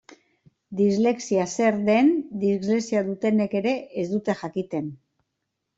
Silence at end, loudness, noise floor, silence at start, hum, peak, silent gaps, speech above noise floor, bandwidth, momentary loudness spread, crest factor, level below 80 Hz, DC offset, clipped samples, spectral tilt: 0.8 s; -24 LUFS; -80 dBFS; 0.1 s; none; -8 dBFS; none; 57 dB; 8 kHz; 9 LU; 16 dB; -66 dBFS; under 0.1%; under 0.1%; -6 dB/octave